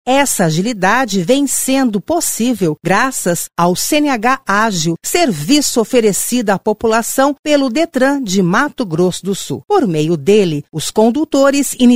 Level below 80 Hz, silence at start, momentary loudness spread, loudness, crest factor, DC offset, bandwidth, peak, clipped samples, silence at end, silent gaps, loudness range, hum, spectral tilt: -46 dBFS; 0.05 s; 4 LU; -14 LUFS; 14 dB; 2%; 16 kHz; 0 dBFS; under 0.1%; 0 s; 7.39-7.43 s; 1 LU; none; -4 dB/octave